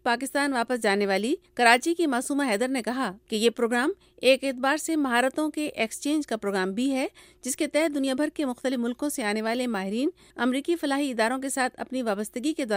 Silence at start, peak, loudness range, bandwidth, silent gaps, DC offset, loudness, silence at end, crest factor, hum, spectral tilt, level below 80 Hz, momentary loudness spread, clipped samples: 0.05 s; -4 dBFS; 3 LU; 16 kHz; none; under 0.1%; -26 LUFS; 0 s; 22 dB; none; -3.5 dB/octave; -66 dBFS; 7 LU; under 0.1%